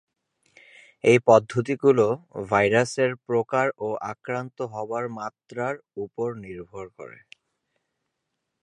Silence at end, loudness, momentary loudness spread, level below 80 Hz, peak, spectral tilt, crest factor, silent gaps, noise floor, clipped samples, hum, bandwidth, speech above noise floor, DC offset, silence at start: 1.5 s; -24 LUFS; 19 LU; -64 dBFS; -2 dBFS; -6 dB/octave; 22 dB; none; -80 dBFS; under 0.1%; none; 11.5 kHz; 57 dB; under 0.1%; 1.05 s